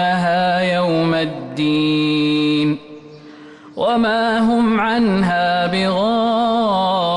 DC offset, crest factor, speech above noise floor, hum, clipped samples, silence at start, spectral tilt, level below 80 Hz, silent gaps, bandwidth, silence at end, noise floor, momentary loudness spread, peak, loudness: under 0.1%; 8 dB; 23 dB; none; under 0.1%; 0 s; -6.5 dB/octave; -50 dBFS; none; 11 kHz; 0 s; -39 dBFS; 5 LU; -8 dBFS; -17 LUFS